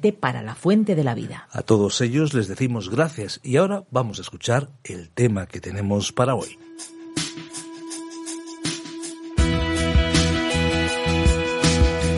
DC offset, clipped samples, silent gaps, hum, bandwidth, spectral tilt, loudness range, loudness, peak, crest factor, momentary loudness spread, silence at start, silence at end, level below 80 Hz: under 0.1%; under 0.1%; none; none; 11.5 kHz; -5 dB/octave; 6 LU; -22 LUFS; -4 dBFS; 18 dB; 14 LU; 0 s; 0 s; -30 dBFS